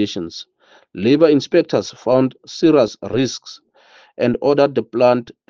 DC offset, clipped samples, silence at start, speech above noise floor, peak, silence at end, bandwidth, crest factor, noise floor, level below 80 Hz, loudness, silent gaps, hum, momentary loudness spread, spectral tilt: under 0.1%; under 0.1%; 0 s; 33 dB; 0 dBFS; 0.2 s; 7.4 kHz; 18 dB; -50 dBFS; -58 dBFS; -17 LUFS; none; none; 16 LU; -6 dB/octave